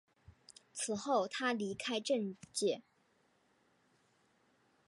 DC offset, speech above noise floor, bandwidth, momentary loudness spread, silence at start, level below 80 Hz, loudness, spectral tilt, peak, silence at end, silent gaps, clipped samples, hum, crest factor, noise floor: under 0.1%; 38 dB; 11 kHz; 7 LU; 0.3 s; -78 dBFS; -37 LUFS; -3 dB/octave; -20 dBFS; 2.05 s; none; under 0.1%; none; 20 dB; -74 dBFS